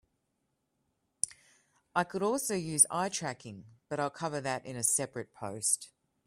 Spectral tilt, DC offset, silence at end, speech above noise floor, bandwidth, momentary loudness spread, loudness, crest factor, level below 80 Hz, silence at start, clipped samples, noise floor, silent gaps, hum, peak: -3 dB/octave; under 0.1%; 0.4 s; 48 dB; 15.5 kHz; 16 LU; -31 LUFS; 28 dB; -72 dBFS; 1.25 s; under 0.1%; -80 dBFS; none; none; -6 dBFS